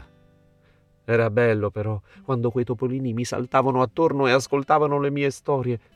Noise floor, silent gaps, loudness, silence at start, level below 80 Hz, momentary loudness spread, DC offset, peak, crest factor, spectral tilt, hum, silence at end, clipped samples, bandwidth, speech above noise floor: -59 dBFS; none; -23 LUFS; 0 s; -60 dBFS; 8 LU; under 0.1%; -4 dBFS; 18 dB; -6.5 dB/octave; none; 0.2 s; under 0.1%; 13 kHz; 37 dB